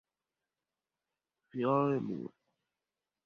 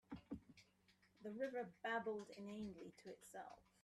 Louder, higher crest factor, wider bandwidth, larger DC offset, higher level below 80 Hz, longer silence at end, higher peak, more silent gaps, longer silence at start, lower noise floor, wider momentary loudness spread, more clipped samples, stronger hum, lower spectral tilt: first, -33 LUFS vs -51 LUFS; about the same, 22 dB vs 18 dB; second, 6.6 kHz vs 13 kHz; neither; about the same, -78 dBFS vs -78 dBFS; first, 1 s vs 0.2 s; first, -18 dBFS vs -34 dBFS; neither; first, 1.55 s vs 0.1 s; first, under -90 dBFS vs -77 dBFS; about the same, 16 LU vs 14 LU; neither; neither; first, -7.5 dB/octave vs -5 dB/octave